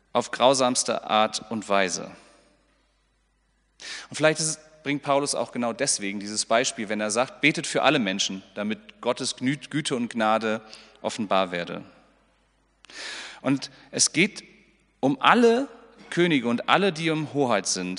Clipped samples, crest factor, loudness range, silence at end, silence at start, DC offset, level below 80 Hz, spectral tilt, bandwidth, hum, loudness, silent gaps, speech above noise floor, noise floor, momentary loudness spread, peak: under 0.1%; 24 dB; 6 LU; 0 s; 0.15 s; under 0.1%; -68 dBFS; -3 dB/octave; 10.5 kHz; none; -24 LUFS; none; 43 dB; -68 dBFS; 13 LU; -2 dBFS